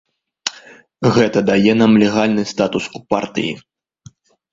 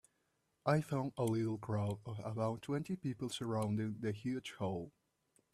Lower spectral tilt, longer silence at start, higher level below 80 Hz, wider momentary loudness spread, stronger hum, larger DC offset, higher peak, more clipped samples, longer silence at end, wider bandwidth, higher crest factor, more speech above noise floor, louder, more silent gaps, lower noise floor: second, -5.5 dB/octave vs -7 dB/octave; second, 0.45 s vs 0.65 s; first, -52 dBFS vs -72 dBFS; first, 14 LU vs 6 LU; neither; neither; first, 0 dBFS vs -18 dBFS; neither; first, 0.95 s vs 0.65 s; second, 7.8 kHz vs 14 kHz; about the same, 16 dB vs 20 dB; second, 31 dB vs 43 dB; first, -16 LUFS vs -39 LUFS; neither; second, -46 dBFS vs -81 dBFS